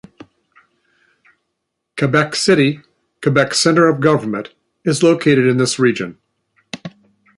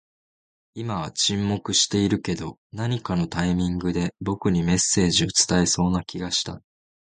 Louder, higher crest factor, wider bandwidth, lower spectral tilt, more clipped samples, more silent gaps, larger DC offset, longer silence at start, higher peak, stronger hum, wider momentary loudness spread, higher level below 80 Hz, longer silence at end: first, -15 LUFS vs -23 LUFS; about the same, 16 dB vs 18 dB; first, 11.5 kHz vs 9.6 kHz; about the same, -5 dB/octave vs -4 dB/octave; neither; second, none vs 2.58-2.70 s; neither; first, 1.95 s vs 0.75 s; first, -2 dBFS vs -6 dBFS; neither; first, 19 LU vs 11 LU; second, -58 dBFS vs -44 dBFS; about the same, 0.5 s vs 0.5 s